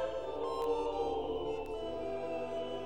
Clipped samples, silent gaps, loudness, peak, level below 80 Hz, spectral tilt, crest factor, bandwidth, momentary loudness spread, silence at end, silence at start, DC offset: under 0.1%; none; -37 LUFS; -24 dBFS; -56 dBFS; -5.5 dB/octave; 14 dB; 12 kHz; 5 LU; 0 s; 0 s; 0.3%